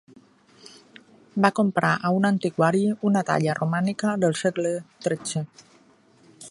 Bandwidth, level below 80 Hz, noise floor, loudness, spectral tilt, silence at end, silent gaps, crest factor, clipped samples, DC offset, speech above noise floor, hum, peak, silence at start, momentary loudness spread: 11.5 kHz; -68 dBFS; -57 dBFS; -24 LUFS; -6 dB/octave; 0 s; none; 24 dB; under 0.1%; under 0.1%; 34 dB; none; -2 dBFS; 1.35 s; 9 LU